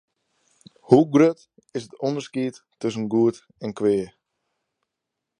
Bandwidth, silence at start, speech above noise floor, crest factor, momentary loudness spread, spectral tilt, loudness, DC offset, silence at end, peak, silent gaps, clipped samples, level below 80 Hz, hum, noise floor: 10.5 kHz; 0.9 s; 62 dB; 24 dB; 17 LU; -7 dB/octave; -22 LUFS; under 0.1%; 1.35 s; 0 dBFS; none; under 0.1%; -66 dBFS; none; -83 dBFS